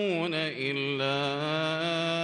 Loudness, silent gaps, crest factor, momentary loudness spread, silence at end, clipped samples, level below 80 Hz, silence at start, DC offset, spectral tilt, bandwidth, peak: -29 LUFS; none; 12 dB; 2 LU; 0 s; under 0.1%; -74 dBFS; 0 s; under 0.1%; -5 dB/octave; 11.5 kHz; -16 dBFS